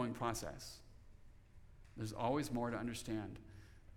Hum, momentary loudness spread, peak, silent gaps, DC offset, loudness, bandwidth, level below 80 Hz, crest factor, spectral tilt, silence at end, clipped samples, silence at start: none; 20 LU; -24 dBFS; none; under 0.1%; -43 LUFS; 19 kHz; -60 dBFS; 20 dB; -5.5 dB/octave; 0 s; under 0.1%; 0 s